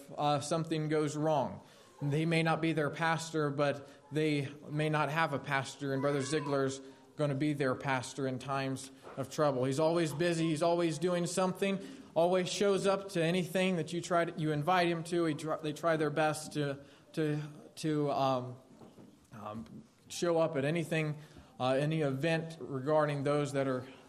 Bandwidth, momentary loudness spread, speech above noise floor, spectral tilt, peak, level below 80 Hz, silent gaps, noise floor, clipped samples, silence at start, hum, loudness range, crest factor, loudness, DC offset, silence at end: 14.5 kHz; 10 LU; 24 dB; -5.5 dB/octave; -14 dBFS; -74 dBFS; none; -57 dBFS; under 0.1%; 0 s; none; 4 LU; 20 dB; -33 LUFS; under 0.1%; 0.05 s